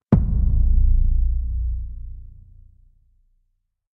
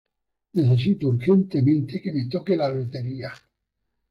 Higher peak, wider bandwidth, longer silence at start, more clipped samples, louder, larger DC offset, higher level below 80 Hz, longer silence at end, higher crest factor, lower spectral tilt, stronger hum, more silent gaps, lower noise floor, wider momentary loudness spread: first, -2 dBFS vs -10 dBFS; second, 2.1 kHz vs 5.6 kHz; second, 0.1 s vs 0.55 s; neither; about the same, -23 LUFS vs -23 LUFS; neither; first, -20 dBFS vs -60 dBFS; first, 1.65 s vs 0.75 s; about the same, 18 dB vs 14 dB; first, -12.5 dB/octave vs -9.5 dB/octave; neither; neither; second, -71 dBFS vs -78 dBFS; first, 18 LU vs 11 LU